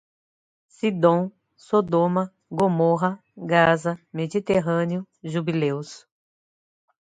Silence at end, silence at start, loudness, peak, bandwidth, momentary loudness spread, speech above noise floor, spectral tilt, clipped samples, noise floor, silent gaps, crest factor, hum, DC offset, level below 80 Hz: 1.15 s; 0.85 s; -23 LUFS; -4 dBFS; 9.4 kHz; 11 LU; over 68 dB; -7 dB/octave; under 0.1%; under -90 dBFS; none; 20 dB; none; under 0.1%; -62 dBFS